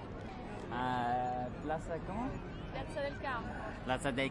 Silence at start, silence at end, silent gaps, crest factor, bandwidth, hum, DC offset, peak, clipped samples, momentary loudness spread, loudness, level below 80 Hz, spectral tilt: 0 s; 0 s; none; 18 dB; 11.5 kHz; none; under 0.1%; -20 dBFS; under 0.1%; 10 LU; -39 LUFS; -50 dBFS; -6 dB/octave